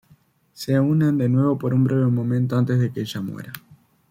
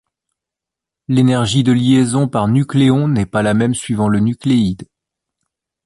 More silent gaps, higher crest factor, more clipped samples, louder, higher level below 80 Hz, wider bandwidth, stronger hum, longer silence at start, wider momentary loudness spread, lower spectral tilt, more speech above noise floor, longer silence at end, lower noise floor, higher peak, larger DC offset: neither; about the same, 12 dB vs 14 dB; neither; second, -21 LUFS vs -15 LUFS; second, -60 dBFS vs -44 dBFS; first, 16 kHz vs 11.5 kHz; neither; second, 0.6 s vs 1.1 s; first, 14 LU vs 5 LU; first, -8 dB/octave vs -6.5 dB/octave; second, 37 dB vs 71 dB; second, 0.5 s vs 1.05 s; second, -57 dBFS vs -85 dBFS; second, -10 dBFS vs -2 dBFS; neither